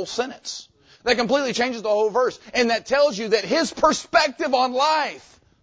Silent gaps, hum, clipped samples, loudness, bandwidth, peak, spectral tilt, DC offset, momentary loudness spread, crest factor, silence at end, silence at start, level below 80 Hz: none; none; under 0.1%; -21 LUFS; 8 kHz; -4 dBFS; -2.5 dB/octave; under 0.1%; 10 LU; 18 dB; 0.45 s; 0 s; -56 dBFS